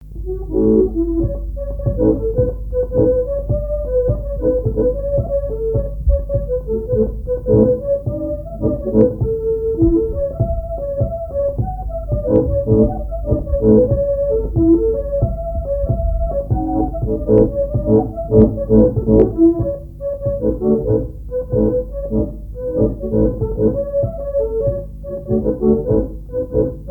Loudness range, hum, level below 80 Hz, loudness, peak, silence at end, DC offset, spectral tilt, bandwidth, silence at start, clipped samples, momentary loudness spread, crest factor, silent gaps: 4 LU; none; -24 dBFS; -18 LUFS; 0 dBFS; 0 s; under 0.1%; -13 dB/octave; 1.9 kHz; 0 s; under 0.1%; 10 LU; 16 dB; none